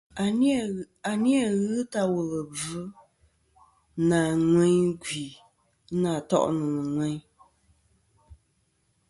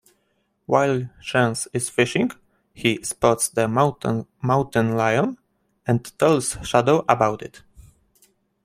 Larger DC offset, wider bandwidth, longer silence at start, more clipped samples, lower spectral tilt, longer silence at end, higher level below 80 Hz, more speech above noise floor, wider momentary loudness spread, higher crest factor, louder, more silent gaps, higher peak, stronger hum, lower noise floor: neither; second, 11.5 kHz vs 16 kHz; second, 0.15 s vs 0.7 s; neither; about the same, -6 dB/octave vs -5 dB/octave; about the same, 0.75 s vs 0.85 s; second, -60 dBFS vs -54 dBFS; about the same, 45 dB vs 48 dB; first, 12 LU vs 8 LU; about the same, 18 dB vs 22 dB; second, -26 LUFS vs -21 LUFS; neither; second, -10 dBFS vs 0 dBFS; neither; about the same, -71 dBFS vs -69 dBFS